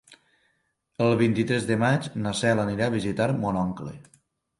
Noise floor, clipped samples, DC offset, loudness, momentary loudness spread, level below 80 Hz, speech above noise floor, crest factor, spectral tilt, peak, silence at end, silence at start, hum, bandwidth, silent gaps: -73 dBFS; under 0.1%; under 0.1%; -25 LUFS; 8 LU; -56 dBFS; 48 dB; 18 dB; -6 dB/octave; -8 dBFS; 0.55 s; 0.1 s; none; 11.5 kHz; none